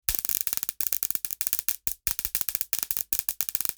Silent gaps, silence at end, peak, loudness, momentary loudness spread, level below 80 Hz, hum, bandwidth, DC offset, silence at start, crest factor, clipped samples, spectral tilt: none; 0.05 s; -2 dBFS; -26 LUFS; 2 LU; -52 dBFS; none; over 20 kHz; under 0.1%; 0.1 s; 28 dB; under 0.1%; 0.5 dB/octave